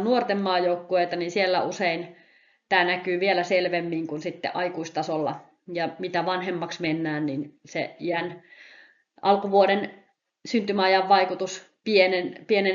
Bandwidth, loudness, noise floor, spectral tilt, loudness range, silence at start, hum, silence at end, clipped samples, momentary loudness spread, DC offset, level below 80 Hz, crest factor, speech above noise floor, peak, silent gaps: 7.4 kHz; -25 LUFS; -55 dBFS; -2.5 dB/octave; 6 LU; 0 s; none; 0 s; under 0.1%; 12 LU; under 0.1%; -74 dBFS; 20 dB; 30 dB; -6 dBFS; none